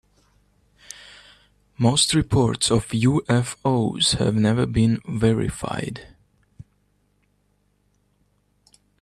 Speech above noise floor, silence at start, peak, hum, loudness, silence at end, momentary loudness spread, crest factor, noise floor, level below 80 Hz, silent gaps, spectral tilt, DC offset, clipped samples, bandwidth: 46 dB; 1 s; -6 dBFS; 50 Hz at -45 dBFS; -21 LUFS; 2.95 s; 16 LU; 18 dB; -66 dBFS; -44 dBFS; none; -5 dB/octave; under 0.1%; under 0.1%; 13 kHz